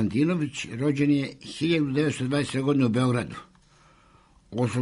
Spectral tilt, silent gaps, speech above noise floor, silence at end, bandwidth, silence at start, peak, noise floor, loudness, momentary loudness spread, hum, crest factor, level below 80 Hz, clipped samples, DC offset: -6.5 dB/octave; none; 33 dB; 0 s; 11 kHz; 0 s; -12 dBFS; -58 dBFS; -25 LUFS; 9 LU; none; 14 dB; -58 dBFS; under 0.1%; under 0.1%